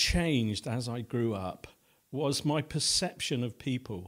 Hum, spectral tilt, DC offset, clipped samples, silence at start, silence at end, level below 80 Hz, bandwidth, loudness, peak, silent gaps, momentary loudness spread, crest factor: none; -4 dB/octave; under 0.1%; under 0.1%; 0 s; 0 s; -46 dBFS; 16 kHz; -31 LUFS; -14 dBFS; none; 9 LU; 18 dB